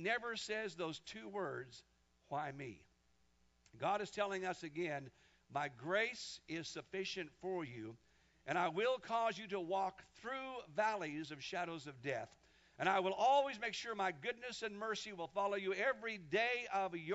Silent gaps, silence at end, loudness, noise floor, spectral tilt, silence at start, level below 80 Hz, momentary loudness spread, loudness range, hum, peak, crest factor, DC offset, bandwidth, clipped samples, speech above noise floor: none; 0 s; -41 LUFS; -76 dBFS; -2 dB/octave; 0 s; -78 dBFS; 11 LU; 6 LU; none; -20 dBFS; 20 dB; under 0.1%; 7.6 kHz; under 0.1%; 35 dB